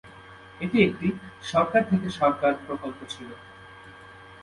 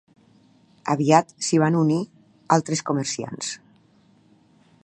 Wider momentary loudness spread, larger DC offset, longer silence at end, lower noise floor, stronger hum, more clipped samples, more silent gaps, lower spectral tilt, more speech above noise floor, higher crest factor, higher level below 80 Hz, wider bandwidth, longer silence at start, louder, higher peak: first, 24 LU vs 13 LU; neither; second, 0 s vs 1.3 s; second, -47 dBFS vs -58 dBFS; neither; neither; neither; first, -6.5 dB/octave vs -5 dB/octave; second, 22 dB vs 36 dB; about the same, 22 dB vs 22 dB; first, -56 dBFS vs -70 dBFS; about the same, 11.5 kHz vs 10.5 kHz; second, 0.05 s vs 0.85 s; second, -25 LUFS vs -22 LUFS; second, -6 dBFS vs -2 dBFS